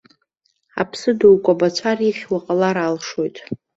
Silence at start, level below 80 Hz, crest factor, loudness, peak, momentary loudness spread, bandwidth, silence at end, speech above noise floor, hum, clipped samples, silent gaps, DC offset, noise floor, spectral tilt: 0.75 s; -60 dBFS; 16 dB; -18 LUFS; -2 dBFS; 13 LU; 8 kHz; 0.2 s; 50 dB; none; under 0.1%; none; under 0.1%; -68 dBFS; -5.5 dB/octave